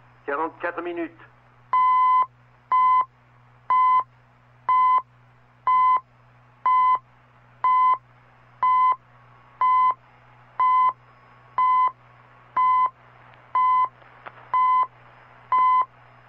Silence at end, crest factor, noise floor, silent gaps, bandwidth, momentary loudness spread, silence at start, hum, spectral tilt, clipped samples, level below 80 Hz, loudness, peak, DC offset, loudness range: 0.45 s; 10 dB; -55 dBFS; none; 4.3 kHz; 12 LU; 0.25 s; none; -6.5 dB/octave; under 0.1%; -70 dBFS; -22 LUFS; -14 dBFS; under 0.1%; 2 LU